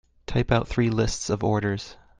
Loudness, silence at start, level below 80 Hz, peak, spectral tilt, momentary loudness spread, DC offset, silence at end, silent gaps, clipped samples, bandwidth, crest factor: -25 LUFS; 0.3 s; -40 dBFS; -6 dBFS; -5.5 dB/octave; 6 LU; under 0.1%; 0.25 s; none; under 0.1%; 9.8 kHz; 20 dB